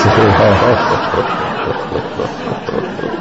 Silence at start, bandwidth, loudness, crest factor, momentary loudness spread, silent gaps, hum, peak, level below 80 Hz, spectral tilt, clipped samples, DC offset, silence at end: 0 s; 8 kHz; -14 LUFS; 14 dB; 11 LU; none; none; 0 dBFS; -32 dBFS; -6.5 dB/octave; under 0.1%; 0.7%; 0 s